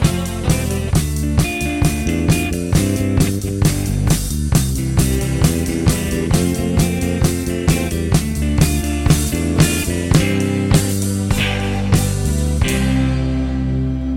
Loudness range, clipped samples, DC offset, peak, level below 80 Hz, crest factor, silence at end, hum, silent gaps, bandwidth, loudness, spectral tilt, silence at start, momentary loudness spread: 1 LU; under 0.1%; under 0.1%; 0 dBFS; -24 dBFS; 16 dB; 0 s; none; none; 17 kHz; -17 LUFS; -5.5 dB/octave; 0 s; 3 LU